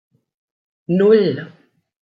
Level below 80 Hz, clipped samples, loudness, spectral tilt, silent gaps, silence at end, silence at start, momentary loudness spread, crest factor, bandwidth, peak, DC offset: -66 dBFS; under 0.1%; -15 LUFS; -9.5 dB/octave; none; 0.75 s; 0.9 s; 25 LU; 18 dB; 5 kHz; -2 dBFS; under 0.1%